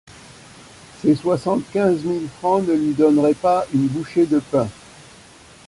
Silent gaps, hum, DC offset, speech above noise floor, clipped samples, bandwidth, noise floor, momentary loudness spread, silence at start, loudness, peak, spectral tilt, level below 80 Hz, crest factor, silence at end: none; none; under 0.1%; 27 dB; under 0.1%; 11.5 kHz; -46 dBFS; 6 LU; 1 s; -19 LUFS; -4 dBFS; -7.5 dB/octave; -54 dBFS; 16 dB; 0.95 s